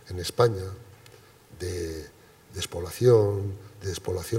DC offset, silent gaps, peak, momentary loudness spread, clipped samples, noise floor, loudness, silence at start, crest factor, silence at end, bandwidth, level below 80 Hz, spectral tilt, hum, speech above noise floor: under 0.1%; none; -8 dBFS; 20 LU; under 0.1%; -53 dBFS; -27 LUFS; 0.05 s; 20 dB; 0 s; 16 kHz; -56 dBFS; -6 dB/octave; none; 26 dB